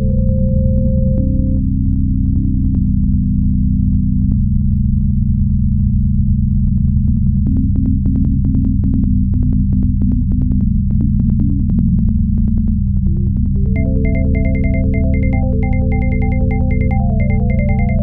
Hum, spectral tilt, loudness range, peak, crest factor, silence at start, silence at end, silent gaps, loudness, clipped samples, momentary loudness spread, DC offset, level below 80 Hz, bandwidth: none; -14 dB/octave; 1 LU; -2 dBFS; 12 dB; 0 s; 0 s; none; -15 LUFS; under 0.1%; 1 LU; 0.4%; -16 dBFS; 2.4 kHz